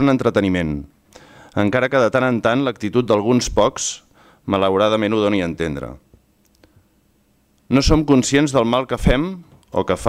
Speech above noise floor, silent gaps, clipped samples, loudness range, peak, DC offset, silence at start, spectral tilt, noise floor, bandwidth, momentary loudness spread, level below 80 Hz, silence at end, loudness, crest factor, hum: 42 dB; none; under 0.1%; 3 LU; -4 dBFS; under 0.1%; 0 s; -5 dB/octave; -59 dBFS; 14.5 kHz; 11 LU; -34 dBFS; 0 s; -18 LUFS; 16 dB; none